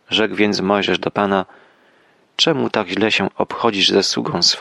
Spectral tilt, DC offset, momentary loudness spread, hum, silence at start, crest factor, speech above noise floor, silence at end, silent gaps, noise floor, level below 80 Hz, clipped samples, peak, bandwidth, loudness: -3.5 dB/octave; under 0.1%; 6 LU; none; 0.1 s; 16 dB; 38 dB; 0 s; none; -55 dBFS; -58 dBFS; under 0.1%; -2 dBFS; 12 kHz; -17 LUFS